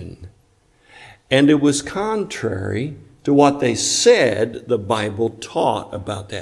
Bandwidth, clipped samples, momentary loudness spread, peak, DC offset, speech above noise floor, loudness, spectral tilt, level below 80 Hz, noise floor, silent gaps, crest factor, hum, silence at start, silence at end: 12 kHz; under 0.1%; 14 LU; 0 dBFS; under 0.1%; 39 dB; -18 LUFS; -4.5 dB/octave; -54 dBFS; -57 dBFS; none; 18 dB; none; 0 s; 0 s